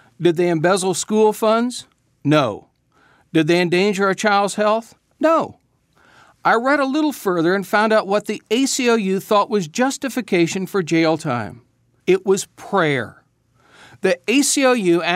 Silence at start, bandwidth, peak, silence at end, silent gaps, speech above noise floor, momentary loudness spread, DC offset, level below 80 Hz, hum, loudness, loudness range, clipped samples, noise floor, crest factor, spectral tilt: 0.2 s; 16 kHz; -2 dBFS; 0 s; none; 41 dB; 8 LU; under 0.1%; -68 dBFS; none; -18 LUFS; 2 LU; under 0.1%; -58 dBFS; 16 dB; -4.5 dB/octave